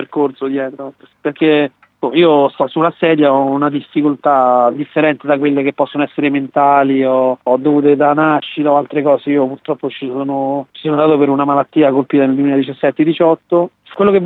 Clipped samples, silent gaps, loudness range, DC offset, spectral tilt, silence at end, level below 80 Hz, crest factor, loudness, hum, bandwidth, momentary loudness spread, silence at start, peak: under 0.1%; none; 2 LU; under 0.1%; -9 dB/octave; 0 s; -62 dBFS; 12 dB; -14 LUFS; none; 4.1 kHz; 9 LU; 0 s; 0 dBFS